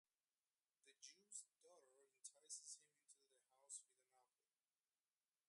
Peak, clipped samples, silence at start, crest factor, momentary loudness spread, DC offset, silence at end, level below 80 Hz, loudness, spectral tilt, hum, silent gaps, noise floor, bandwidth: -44 dBFS; under 0.1%; 0.85 s; 24 dB; 9 LU; under 0.1%; 1.25 s; under -90 dBFS; -60 LUFS; 2.5 dB/octave; none; none; under -90 dBFS; 11.5 kHz